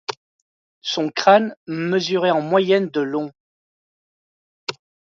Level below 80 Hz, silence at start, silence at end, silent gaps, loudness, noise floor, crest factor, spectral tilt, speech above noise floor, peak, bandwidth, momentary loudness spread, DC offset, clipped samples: -72 dBFS; 0.1 s; 0.4 s; 0.17-0.82 s, 1.57-1.66 s, 3.40-4.67 s; -19 LUFS; under -90 dBFS; 20 dB; -5 dB/octave; over 71 dB; 0 dBFS; 7.6 kHz; 16 LU; under 0.1%; under 0.1%